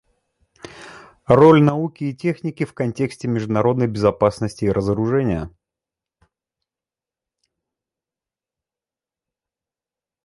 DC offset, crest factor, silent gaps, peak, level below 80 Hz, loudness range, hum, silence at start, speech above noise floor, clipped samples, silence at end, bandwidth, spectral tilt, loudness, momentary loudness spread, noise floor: under 0.1%; 22 dB; none; 0 dBFS; -48 dBFS; 9 LU; none; 0.75 s; over 72 dB; under 0.1%; 4.75 s; 11.5 kHz; -8 dB/octave; -19 LUFS; 17 LU; under -90 dBFS